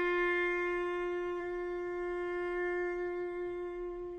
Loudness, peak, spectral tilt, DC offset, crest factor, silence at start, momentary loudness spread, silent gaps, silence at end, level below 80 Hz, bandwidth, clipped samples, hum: -35 LUFS; -24 dBFS; -5.5 dB/octave; under 0.1%; 12 dB; 0 s; 8 LU; none; 0 s; -58 dBFS; 6.8 kHz; under 0.1%; none